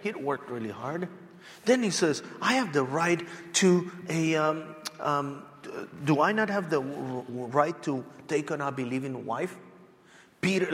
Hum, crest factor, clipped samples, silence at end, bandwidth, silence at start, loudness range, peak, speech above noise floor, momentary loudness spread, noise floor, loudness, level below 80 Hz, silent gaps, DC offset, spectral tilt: none; 20 dB; under 0.1%; 0 s; 16 kHz; 0 s; 5 LU; -10 dBFS; 28 dB; 12 LU; -57 dBFS; -29 LUFS; -74 dBFS; none; under 0.1%; -4.5 dB/octave